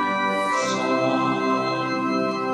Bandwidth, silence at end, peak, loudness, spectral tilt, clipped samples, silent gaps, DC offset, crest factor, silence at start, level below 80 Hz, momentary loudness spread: 12 kHz; 0 s; -10 dBFS; -22 LUFS; -4.5 dB/octave; under 0.1%; none; under 0.1%; 12 dB; 0 s; -74 dBFS; 2 LU